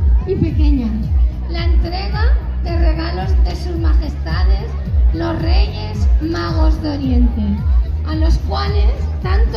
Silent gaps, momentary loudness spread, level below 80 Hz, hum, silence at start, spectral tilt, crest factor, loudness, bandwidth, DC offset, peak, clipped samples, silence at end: none; 4 LU; -16 dBFS; none; 0 s; -8 dB/octave; 12 dB; -17 LUFS; 6.2 kHz; under 0.1%; -2 dBFS; under 0.1%; 0 s